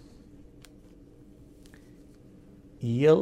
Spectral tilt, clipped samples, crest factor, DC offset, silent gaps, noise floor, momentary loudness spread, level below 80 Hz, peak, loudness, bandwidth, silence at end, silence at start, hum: -8 dB/octave; under 0.1%; 20 dB; under 0.1%; none; -53 dBFS; 26 LU; -58 dBFS; -10 dBFS; -26 LUFS; 9.8 kHz; 0 s; 2.8 s; none